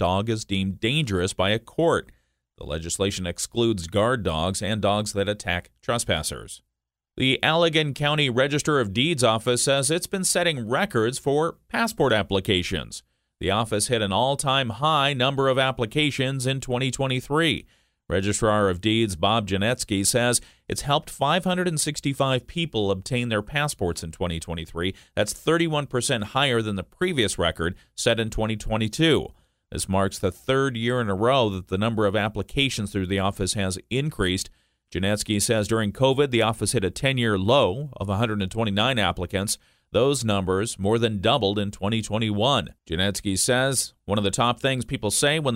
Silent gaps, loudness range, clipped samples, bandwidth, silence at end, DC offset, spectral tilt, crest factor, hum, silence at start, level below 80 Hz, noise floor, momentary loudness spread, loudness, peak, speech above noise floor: none; 3 LU; under 0.1%; 16 kHz; 0 s; under 0.1%; -4 dB/octave; 22 dB; none; 0 s; -46 dBFS; -83 dBFS; 7 LU; -24 LUFS; -2 dBFS; 60 dB